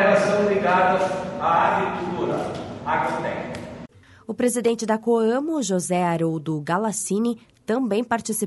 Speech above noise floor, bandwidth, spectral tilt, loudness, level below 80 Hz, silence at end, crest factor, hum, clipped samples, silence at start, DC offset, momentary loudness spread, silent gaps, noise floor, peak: 22 dB; 11.5 kHz; -5 dB/octave; -22 LUFS; -58 dBFS; 0 s; 16 dB; none; under 0.1%; 0 s; under 0.1%; 12 LU; none; -44 dBFS; -6 dBFS